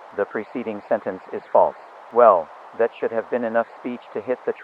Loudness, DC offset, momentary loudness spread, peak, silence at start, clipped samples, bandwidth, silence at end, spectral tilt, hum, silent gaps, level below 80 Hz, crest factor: -22 LUFS; under 0.1%; 15 LU; 0 dBFS; 0 s; under 0.1%; 5.2 kHz; 0 s; -7.5 dB/octave; none; none; -74 dBFS; 22 dB